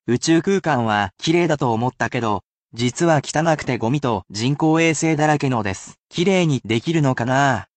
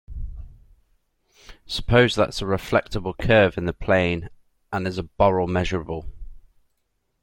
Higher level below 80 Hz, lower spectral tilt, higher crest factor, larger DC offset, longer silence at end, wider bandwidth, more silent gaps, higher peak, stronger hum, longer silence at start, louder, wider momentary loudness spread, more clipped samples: second, -54 dBFS vs -38 dBFS; about the same, -5.5 dB/octave vs -6 dB/octave; second, 14 dB vs 22 dB; neither; second, 0.15 s vs 0.85 s; second, 9 kHz vs 16.5 kHz; first, 2.44-2.67 s, 6.00-6.05 s vs none; about the same, -4 dBFS vs -2 dBFS; neither; about the same, 0.1 s vs 0.1 s; first, -19 LUFS vs -22 LUFS; second, 6 LU vs 17 LU; neither